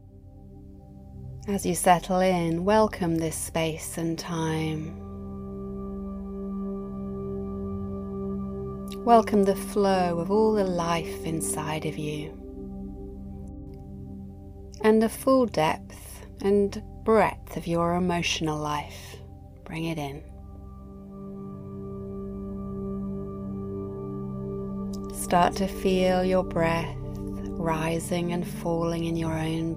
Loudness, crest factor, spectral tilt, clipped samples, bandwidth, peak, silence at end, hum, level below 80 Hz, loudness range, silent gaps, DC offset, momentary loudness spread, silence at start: -27 LUFS; 22 dB; -5.5 dB/octave; under 0.1%; 16.5 kHz; -6 dBFS; 0 s; 50 Hz at -55 dBFS; -46 dBFS; 11 LU; none; under 0.1%; 19 LU; 0 s